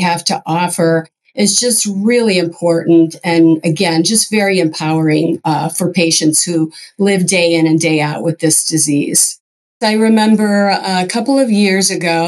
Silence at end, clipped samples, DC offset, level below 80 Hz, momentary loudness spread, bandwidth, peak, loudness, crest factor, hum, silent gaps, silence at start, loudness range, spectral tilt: 0 s; under 0.1%; under 0.1%; -68 dBFS; 5 LU; 12.5 kHz; 0 dBFS; -12 LUFS; 12 dB; none; 9.40-9.80 s; 0 s; 1 LU; -4 dB/octave